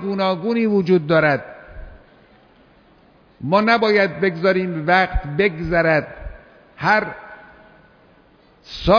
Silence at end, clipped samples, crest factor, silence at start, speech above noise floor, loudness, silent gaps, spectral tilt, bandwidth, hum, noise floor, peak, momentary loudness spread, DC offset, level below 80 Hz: 0 s; under 0.1%; 16 dB; 0 s; 35 dB; -18 LUFS; none; -7.5 dB/octave; 5.4 kHz; none; -53 dBFS; -4 dBFS; 21 LU; under 0.1%; -38 dBFS